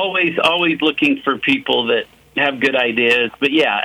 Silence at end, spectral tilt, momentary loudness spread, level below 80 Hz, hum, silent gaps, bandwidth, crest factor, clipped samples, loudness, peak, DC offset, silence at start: 0 s; -4.5 dB/octave; 4 LU; -60 dBFS; none; none; 16 kHz; 14 dB; under 0.1%; -16 LUFS; -2 dBFS; under 0.1%; 0 s